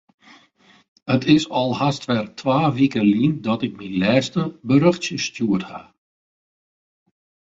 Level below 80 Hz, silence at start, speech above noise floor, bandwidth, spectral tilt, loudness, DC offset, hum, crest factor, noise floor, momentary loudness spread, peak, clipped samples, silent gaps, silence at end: -58 dBFS; 1.05 s; 36 dB; 8 kHz; -6 dB/octave; -20 LUFS; under 0.1%; none; 20 dB; -55 dBFS; 8 LU; -2 dBFS; under 0.1%; none; 1.65 s